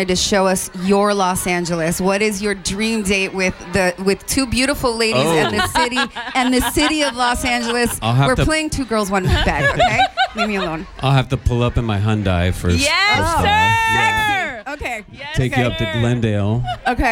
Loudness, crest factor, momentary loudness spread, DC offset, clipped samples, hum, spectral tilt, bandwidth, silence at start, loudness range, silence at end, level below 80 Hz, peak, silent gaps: -17 LUFS; 12 dB; 6 LU; under 0.1%; under 0.1%; none; -4.5 dB/octave; 17 kHz; 0 s; 2 LU; 0 s; -32 dBFS; -4 dBFS; none